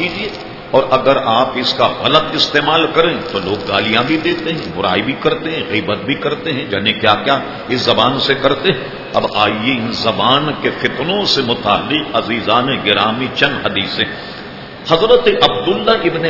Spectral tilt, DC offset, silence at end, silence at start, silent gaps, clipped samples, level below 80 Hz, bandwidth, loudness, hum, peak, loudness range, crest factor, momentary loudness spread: -5 dB/octave; under 0.1%; 0 s; 0 s; none; 0.1%; -44 dBFS; 6 kHz; -14 LUFS; none; 0 dBFS; 3 LU; 14 dB; 7 LU